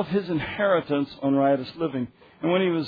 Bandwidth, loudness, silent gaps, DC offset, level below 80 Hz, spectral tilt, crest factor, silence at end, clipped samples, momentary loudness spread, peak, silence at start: 5 kHz; -25 LUFS; none; under 0.1%; -58 dBFS; -9 dB/octave; 14 dB; 0 s; under 0.1%; 8 LU; -10 dBFS; 0 s